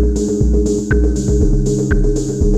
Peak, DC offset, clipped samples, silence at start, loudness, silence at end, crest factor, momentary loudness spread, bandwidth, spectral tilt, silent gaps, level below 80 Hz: -2 dBFS; under 0.1%; under 0.1%; 0 s; -16 LUFS; 0 s; 12 dB; 1 LU; 10 kHz; -7 dB/octave; none; -16 dBFS